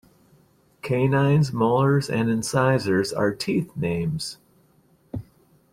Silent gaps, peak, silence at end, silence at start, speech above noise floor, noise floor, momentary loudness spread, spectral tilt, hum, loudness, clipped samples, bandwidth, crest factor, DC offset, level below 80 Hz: none; -8 dBFS; 0.5 s; 0.85 s; 38 dB; -60 dBFS; 17 LU; -6.5 dB/octave; none; -23 LUFS; under 0.1%; 15 kHz; 16 dB; under 0.1%; -56 dBFS